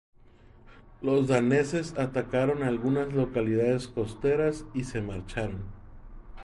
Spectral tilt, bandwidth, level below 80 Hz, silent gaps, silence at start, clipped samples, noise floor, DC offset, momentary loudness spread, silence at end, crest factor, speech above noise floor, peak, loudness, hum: -7 dB/octave; 11.5 kHz; -48 dBFS; none; 0.65 s; under 0.1%; -54 dBFS; under 0.1%; 11 LU; 0 s; 18 dB; 27 dB; -10 dBFS; -28 LUFS; none